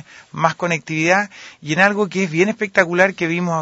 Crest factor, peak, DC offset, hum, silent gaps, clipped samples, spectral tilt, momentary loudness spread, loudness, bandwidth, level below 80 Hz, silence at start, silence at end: 18 dB; 0 dBFS; under 0.1%; none; none; under 0.1%; -5 dB/octave; 7 LU; -17 LUFS; 8 kHz; -62 dBFS; 0.15 s; 0 s